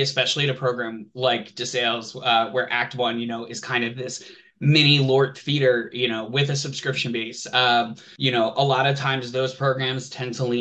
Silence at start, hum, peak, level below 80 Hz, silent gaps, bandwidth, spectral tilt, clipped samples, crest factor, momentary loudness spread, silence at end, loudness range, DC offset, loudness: 0 s; none; -4 dBFS; -68 dBFS; none; 8.8 kHz; -4.5 dB/octave; under 0.1%; 20 dB; 10 LU; 0 s; 3 LU; under 0.1%; -22 LUFS